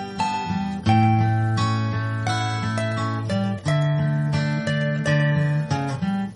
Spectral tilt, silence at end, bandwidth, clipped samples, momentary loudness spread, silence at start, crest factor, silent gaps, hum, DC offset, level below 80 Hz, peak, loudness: -6.5 dB/octave; 0 s; 11 kHz; under 0.1%; 6 LU; 0 s; 16 dB; none; none; under 0.1%; -50 dBFS; -6 dBFS; -22 LUFS